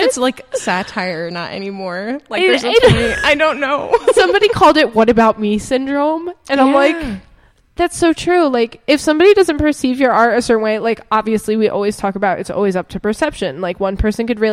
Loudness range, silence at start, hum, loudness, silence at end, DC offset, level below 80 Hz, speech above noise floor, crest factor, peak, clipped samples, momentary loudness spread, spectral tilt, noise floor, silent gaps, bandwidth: 5 LU; 0 s; none; -14 LUFS; 0 s; under 0.1%; -36 dBFS; 35 dB; 14 dB; 0 dBFS; under 0.1%; 12 LU; -4.5 dB/octave; -49 dBFS; none; 15 kHz